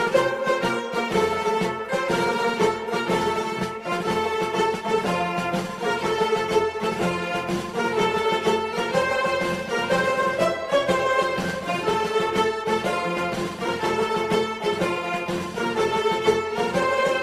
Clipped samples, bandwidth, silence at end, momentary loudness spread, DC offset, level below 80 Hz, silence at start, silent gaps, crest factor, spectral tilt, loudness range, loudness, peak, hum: under 0.1%; 15.5 kHz; 0 s; 5 LU; under 0.1%; -54 dBFS; 0 s; none; 16 dB; -4.5 dB/octave; 2 LU; -23 LUFS; -8 dBFS; none